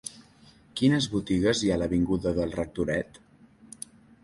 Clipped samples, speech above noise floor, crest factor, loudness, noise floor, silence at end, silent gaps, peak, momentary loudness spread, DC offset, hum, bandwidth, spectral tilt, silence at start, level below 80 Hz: under 0.1%; 30 dB; 18 dB; -27 LUFS; -56 dBFS; 1.2 s; none; -10 dBFS; 19 LU; under 0.1%; none; 11.5 kHz; -5.5 dB/octave; 0.05 s; -48 dBFS